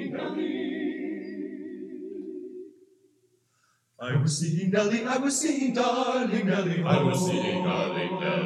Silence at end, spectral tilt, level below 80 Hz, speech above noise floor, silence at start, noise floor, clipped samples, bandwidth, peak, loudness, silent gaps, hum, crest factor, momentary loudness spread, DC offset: 0 s; -5 dB/octave; -80 dBFS; 44 dB; 0 s; -69 dBFS; under 0.1%; 13.5 kHz; -10 dBFS; -27 LUFS; none; none; 18 dB; 14 LU; under 0.1%